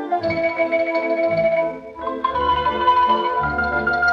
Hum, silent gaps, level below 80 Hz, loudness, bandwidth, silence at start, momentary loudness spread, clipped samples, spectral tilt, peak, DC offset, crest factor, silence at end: none; none; -44 dBFS; -19 LUFS; 6.6 kHz; 0 s; 7 LU; under 0.1%; -6.5 dB/octave; -6 dBFS; under 0.1%; 14 dB; 0 s